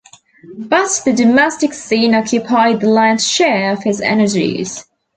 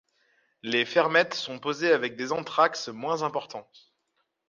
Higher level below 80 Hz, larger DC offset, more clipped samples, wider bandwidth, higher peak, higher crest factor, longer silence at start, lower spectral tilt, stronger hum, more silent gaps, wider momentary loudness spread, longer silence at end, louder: first, -56 dBFS vs -78 dBFS; neither; neither; first, 9.4 kHz vs 7.4 kHz; first, 0 dBFS vs -6 dBFS; second, 14 dB vs 22 dB; second, 0.5 s vs 0.65 s; about the same, -3.5 dB/octave vs -3.5 dB/octave; neither; neither; second, 8 LU vs 12 LU; second, 0.35 s vs 0.85 s; first, -13 LUFS vs -26 LUFS